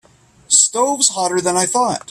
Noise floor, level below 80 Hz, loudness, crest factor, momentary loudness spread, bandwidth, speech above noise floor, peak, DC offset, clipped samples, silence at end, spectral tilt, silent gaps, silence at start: -38 dBFS; -60 dBFS; -14 LUFS; 18 dB; 5 LU; 15.5 kHz; 21 dB; 0 dBFS; under 0.1%; under 0.1%; 0.1 s; -1.5 dB/octave; none; 0.5 s